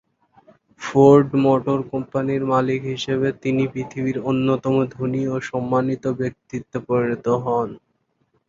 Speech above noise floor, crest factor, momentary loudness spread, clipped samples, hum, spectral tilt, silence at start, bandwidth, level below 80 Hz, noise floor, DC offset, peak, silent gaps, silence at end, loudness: 49 dB; 18 dB; 11 LU; under 0.1%; none; -7.5 dB/octave; 0.8 s; 7.6 kHz; -56 dBFS; -68 dBFS; under 0.1%; -2 dBFS; none; 0.7 s; -20 LUFS